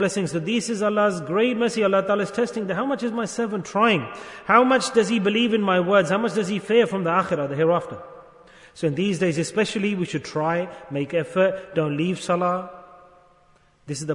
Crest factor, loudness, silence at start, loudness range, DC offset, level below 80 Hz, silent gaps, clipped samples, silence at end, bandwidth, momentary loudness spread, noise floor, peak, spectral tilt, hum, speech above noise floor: 20 dB; -22 LUFS; 0 s; 5 LU; under 0.1%; -64 dBFS; none; under 0.1%; 0 s; 11 kHz; 8 LU; -58 dBFS; -2 dBFS; -5 dB/octave; none; 36 dB